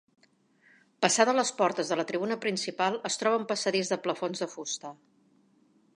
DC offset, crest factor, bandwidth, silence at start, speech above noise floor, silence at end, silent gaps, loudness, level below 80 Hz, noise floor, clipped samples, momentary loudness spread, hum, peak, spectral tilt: under 0.1%; 24 dB; 11.5 kHz; 1 s; 36 dB; 1 s; none; -29 LUFS; -82 dBFS; -65 dBFS; under 0.1%; 11 LU; none; -6 dBFS; -2.5 dB/octave